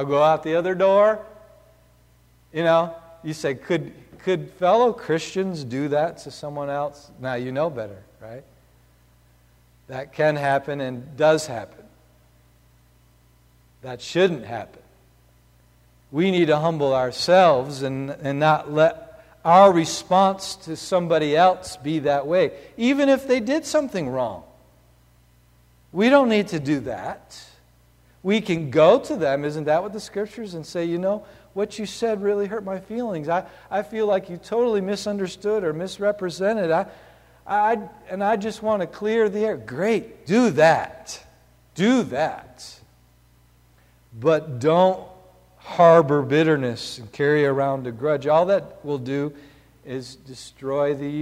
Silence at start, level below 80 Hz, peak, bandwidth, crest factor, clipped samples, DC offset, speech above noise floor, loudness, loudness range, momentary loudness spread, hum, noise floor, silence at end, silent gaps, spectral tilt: 0 s; -58 dBFS; -2 dBFS; 15.5 kHz; 20 dB; under 0.1%; under 0.1%; 35 dB; -21 LUFS; 9 LU; 17 LU; 60 Hz at -55 dBFS; -56 dBFS; 0 s; none; -5.5 dB/octave